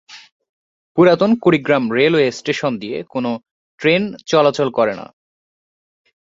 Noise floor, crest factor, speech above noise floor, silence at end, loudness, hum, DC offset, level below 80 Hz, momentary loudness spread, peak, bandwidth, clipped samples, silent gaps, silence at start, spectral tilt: under -90 dBFS; 16 dB; over 74 dB; 1.35 s; -16 LUFS; none; under 0.1%; -60 dBFS; 11 LU; -2 dBFS; 7.8 kHz; under 0.1%; 0.32-0.40 s, 0.49-0.95 s, 3.51-3.78 s; 0.1 s; -6 dB/octave